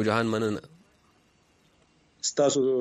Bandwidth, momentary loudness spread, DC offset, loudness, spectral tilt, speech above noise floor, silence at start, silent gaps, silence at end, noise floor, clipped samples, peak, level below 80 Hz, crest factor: 12.5 kHz; 8 LU; under 0.1%; -27 LUFS; -4 dB/octave; 39 dB; 0 s; none; 0 s; -64 dBFS; under 0.1%; -10 dBFS; -68 dBFS; 18 dB